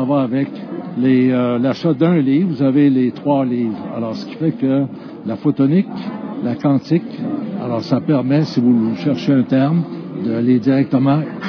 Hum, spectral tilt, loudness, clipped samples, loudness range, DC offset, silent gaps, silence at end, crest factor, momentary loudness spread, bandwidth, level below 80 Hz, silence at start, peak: none; -9 dB/octave; -17 LUFS; under 0.1%; 3 LU; under 0.1%; none; 0 s; 14 dB; 10 LU; 5.4 kHz; -64 dBFS; 0 s; -2 dBFS